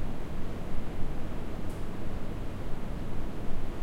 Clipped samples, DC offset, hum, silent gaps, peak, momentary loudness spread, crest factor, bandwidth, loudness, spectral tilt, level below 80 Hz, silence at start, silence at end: under 0.1%; under 0.1%; none; none; -14 dBFS; 1 LU; 12 dB; 5 kHz; -39 LUFS; -7 dB/octave; -36 dBFS; 0 s; 0 s